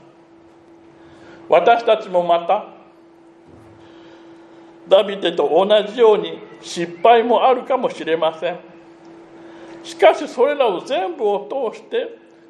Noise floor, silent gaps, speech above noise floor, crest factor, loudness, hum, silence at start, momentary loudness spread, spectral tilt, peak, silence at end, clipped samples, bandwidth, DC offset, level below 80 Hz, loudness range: -47 dBFS; none; 31 dB; 18 dB; -17 LUFS; none; 1.3 s; 16 LU; -4.5 dB/octave; 0 dBFS; 0.35 s; under 0.1%; 11 kHz; under 0.1%; -72 dBFS; 5 LU